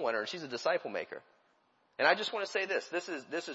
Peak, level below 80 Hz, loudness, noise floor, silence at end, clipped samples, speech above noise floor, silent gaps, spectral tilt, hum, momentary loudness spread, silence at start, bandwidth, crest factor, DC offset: -10 dBFS; -90 dBFS; -33 LUFS; -72 dBFS; 0 s; under 0.1%; 38 dB; none; -0.5 dB/octave; none; 13 LU; 0 s; 7.6 kHz; 24 dB; under 0.1%